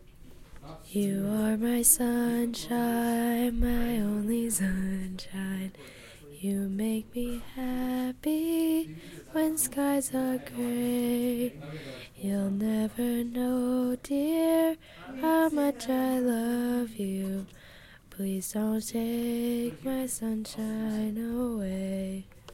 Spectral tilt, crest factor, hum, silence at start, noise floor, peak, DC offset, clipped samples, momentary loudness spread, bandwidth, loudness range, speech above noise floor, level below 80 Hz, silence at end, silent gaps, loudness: -4.5 dB/octave; 22 dB; none; 0 s; -52 dBFS; -8 dBFS; under 0.1%; under 0.1%; 11 LU; 16.5 kHz; 6 LU; 23 dB; -48 dBFS; 0 s; none; -29 LUFS